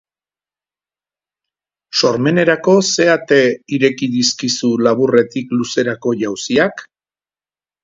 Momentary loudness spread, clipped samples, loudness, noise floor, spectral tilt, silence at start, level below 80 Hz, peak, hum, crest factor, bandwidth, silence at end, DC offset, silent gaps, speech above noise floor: 7 LU; under 0.1%; -15 LUFS; under -90 dBFS; -4 dB/octave; 1.95 s; -60 dBFS; 0 dBFS; 50 Hz at -45 dBFS; 16 dB; 7.8 kHz; 1 s; under 0.1%; none; over 76 dB